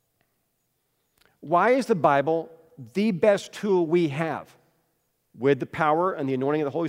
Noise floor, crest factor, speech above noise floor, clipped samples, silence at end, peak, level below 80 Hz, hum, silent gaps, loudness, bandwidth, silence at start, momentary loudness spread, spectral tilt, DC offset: -74 dBFS; 18 dB; 51 dB; under 0.1%; 0 s; -6 dBFS; -70 dBFS; none; none; -24 LUFS; 15.5 kHz; 1.45 s; 8 LU; -6.5 dB/octave; under 0.1%